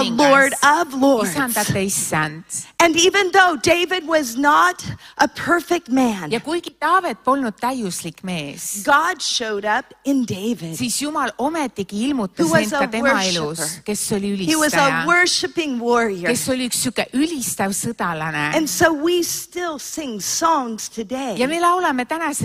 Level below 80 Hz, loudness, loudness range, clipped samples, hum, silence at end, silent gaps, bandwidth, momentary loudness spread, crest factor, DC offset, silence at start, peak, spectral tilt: -56 dBFS; -19 LUFS; 4 LU; under 0.1%; none; 0 s; none; 16 kHz; 11 LU; 18 dB; under 0.1%; 0 s; -2 dBFS; -3 dB/octave